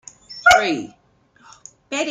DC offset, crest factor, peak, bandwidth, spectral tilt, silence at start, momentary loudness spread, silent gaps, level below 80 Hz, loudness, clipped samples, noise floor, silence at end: under 0.1%; 20 dB; 0 dBFS; 15.5 kHz; -2 dB/octave; 0.3 s; 23 LU; none; -52 dBFS; -17 LUFS; under 0.1%; -53 dBFS; 0 s